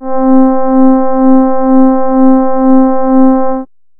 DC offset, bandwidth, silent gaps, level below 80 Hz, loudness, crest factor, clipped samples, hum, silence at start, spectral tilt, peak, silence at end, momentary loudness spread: under 0.1%; 2.2 kHz; none; -40 dBFS; -8 LUFS; 6 dB; 0.2%; none; 0 s; -13 dB/octave; 0 dBFS; 0.35 s; 2 LU